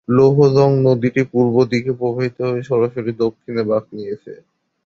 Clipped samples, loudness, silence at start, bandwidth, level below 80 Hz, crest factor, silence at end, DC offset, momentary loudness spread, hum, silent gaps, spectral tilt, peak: under 0.1%; -17 LUFS; 0.1 s; 7 kHz; -56 dBFS; 16 dB; 0.5 s; under 0.1%; 11 LU; none; none; -8.5 dB/octave; -2 dBFS